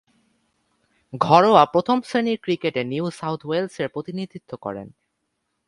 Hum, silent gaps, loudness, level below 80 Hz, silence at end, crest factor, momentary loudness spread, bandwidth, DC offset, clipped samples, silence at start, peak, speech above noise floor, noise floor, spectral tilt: none; none; -21 LUFS; -64 dBFS; 0.8 s; 22 dB; 18 LU; 11.5 kHz; under 0.1%; under 0.1%; 1.15 s; 0 dBFS; 54 dB; -75 dBFS; -6.5 dB/octave